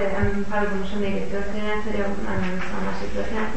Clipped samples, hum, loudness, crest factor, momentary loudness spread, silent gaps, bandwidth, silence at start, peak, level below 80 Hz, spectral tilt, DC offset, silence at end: under 0.1%; none; -27 LUFS; 16 dB; 4 LU; none; 8.8 kHz; 0 s; -10 dBFS; -36 dBFS; -6.5 dB/octave; 9%; 0 s